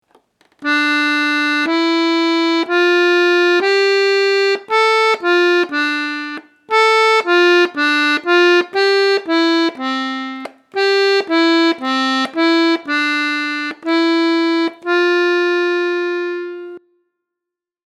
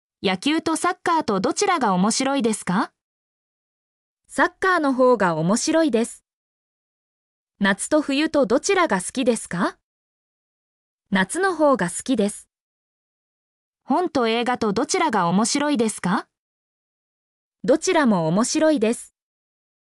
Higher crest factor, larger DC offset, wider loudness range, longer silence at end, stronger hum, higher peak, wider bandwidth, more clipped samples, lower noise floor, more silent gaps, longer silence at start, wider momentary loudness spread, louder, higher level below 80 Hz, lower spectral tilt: about the same, 16 dB vs 16 dB; neither; about the same, 3 LU vs 3 LU; first, 1.1 s vs 0.85 s; neither; first, 0 dBFS vs -8 dBFS; second, 11.5 kHz vs 13.5 kHz; neither; second, -84 dBFS vs under -90 dBFS; second, none vs 3.03-4.17 s, 6.33-7.47 s, 9.83-10.99 s, 12.61-13.73 s, 16.39-17.52 s; first, 0.6 s vs 0.2 s; first, 9 LU vs 6 LU; first, -14 LUFS vs -21 LUFS; second, -80 dBFS vs -62 dBFS; second, -1.5 dB/octave vs -4.5 dB/octave